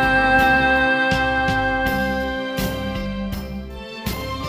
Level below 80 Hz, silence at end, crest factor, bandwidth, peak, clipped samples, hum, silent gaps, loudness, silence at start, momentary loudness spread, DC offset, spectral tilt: -34 dBFS; 0 s; 16 dB; 16 kHz; -4 dBFS; under 0.1%; none; none; -19 LUFS; 0 s; 15 LU; under 0.1%; -5 dB/octave